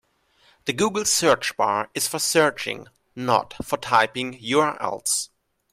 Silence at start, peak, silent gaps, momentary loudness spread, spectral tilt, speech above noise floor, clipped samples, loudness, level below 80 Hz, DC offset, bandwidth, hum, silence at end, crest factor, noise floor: 0.65 s; -4 dBFS; none; 11 LU; -2.5 dB/octave; 38 dB; under 0.1%; -22 LUFS; -58 dBFS; under 0.1%; 16 kHz; none; 0.45 s; 20 dB; -61 dBFS